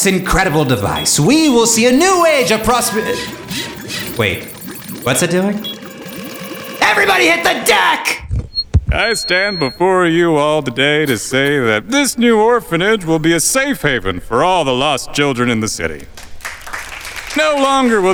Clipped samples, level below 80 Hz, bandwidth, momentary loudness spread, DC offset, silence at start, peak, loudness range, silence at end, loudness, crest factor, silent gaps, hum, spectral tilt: under 0.1%; -32 dBFS; over 20 kHz; 15 LU; under 0.1%; 0 s; 0 dBFS; 5 LU; 0 s; -13 LUFS; 14 dB; none; none; -3.5 dB/octave